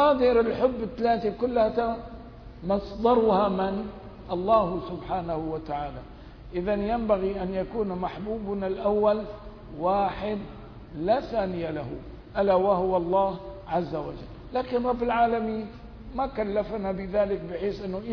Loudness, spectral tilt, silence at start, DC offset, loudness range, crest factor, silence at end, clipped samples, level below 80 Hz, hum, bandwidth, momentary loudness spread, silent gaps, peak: -27 LUFS; -9 dB/octave; 0 s; under 0.1%; 4 LU; 18 dB; 0 s; under 0.1%; -46 dBFS; none; 5.4 kHz; 16 LU; none; -10 dBFS